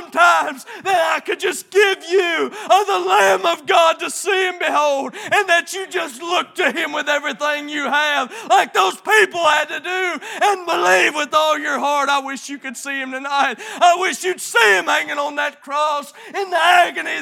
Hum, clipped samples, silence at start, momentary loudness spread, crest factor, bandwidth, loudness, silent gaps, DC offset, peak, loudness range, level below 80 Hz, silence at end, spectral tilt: none; under 0.1%; 0 s; 10 LU; 18 dB; 17.5 kHz; -17 LUFS; none; under 0.1%; 0 dBFS; 3 LU; -82 dBFS; 0 s; -1 dB/octave